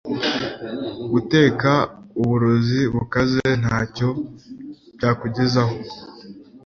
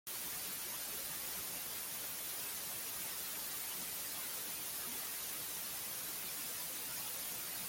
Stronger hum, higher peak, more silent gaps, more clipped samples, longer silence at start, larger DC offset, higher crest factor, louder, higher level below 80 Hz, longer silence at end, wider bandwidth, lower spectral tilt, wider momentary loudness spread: neither; first, -2 dBFS vs -30 dBFS; neither; neither; about the same, 0.05 s vs 0.05 s; neither; first, 20 dB vs 14 dB; first, -20 LUFS vs -40 LUFS; first, -46 dBFS vs -72 dBFS; about the same, 0.1 s vs 0 s; second, 7 kHz vs 17 kHz; first, -6.5 dB/octave vs 0 dB/octave; first, 21 LU vs 0 LU